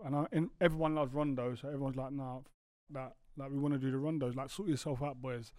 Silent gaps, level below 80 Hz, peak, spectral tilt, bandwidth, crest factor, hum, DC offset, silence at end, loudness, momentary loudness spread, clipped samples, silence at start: 2.54-2.87 s; -58 dBFS; -16 dBFS; -7 dB/octave; 15 kHz; 20 dB; none; under 0.1%; 0 s; -37 LUFS; 14 LU; under 0.1%; 0 s